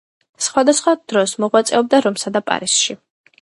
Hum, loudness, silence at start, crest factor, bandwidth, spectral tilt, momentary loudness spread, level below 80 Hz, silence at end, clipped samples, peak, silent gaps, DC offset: none; -16 LUFS; 0.4 s; 18 dB; 11.5 kHz; -2.5 dB/octave; 7 LU; -64 dBFS; 0.45 s; under 0.1%; 0 dBFS; none; under 0.1%